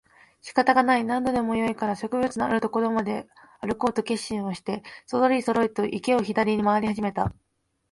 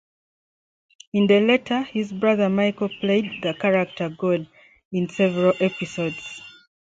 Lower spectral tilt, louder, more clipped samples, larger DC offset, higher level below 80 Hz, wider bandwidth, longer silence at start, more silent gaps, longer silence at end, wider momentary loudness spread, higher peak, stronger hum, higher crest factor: about the same, -5.5 dB/octave vs -6.5 dB/octave; second, -25 LUFS vs -22 LUFS; neither; neither; first, -54 dBFS vs -64 dBFS; first, 11.5 kHz vs 7.8 kHz; second, 0.45 s vs 1.15 s; second, none vs 4.85-4.91 s; first, 0.6 s vs 0.35 s; about the same, 10 LU vs 10 LU; about the same, -6 dBFS vs -6 dBFS; neither; about the same, 20 dB vs 18 dB